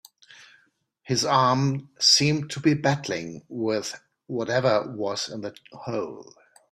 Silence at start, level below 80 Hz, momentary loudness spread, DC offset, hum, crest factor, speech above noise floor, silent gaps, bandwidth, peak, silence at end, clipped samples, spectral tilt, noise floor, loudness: 0.4 s; -64 dBFS; 18 LU; under 0.1%; none; 20 dB; 41 dB; none; 15 kHz; -4 dBFS; 0.5 s; under 0.1%; -4 dB/octave; -65 dBFS; -24 LUFS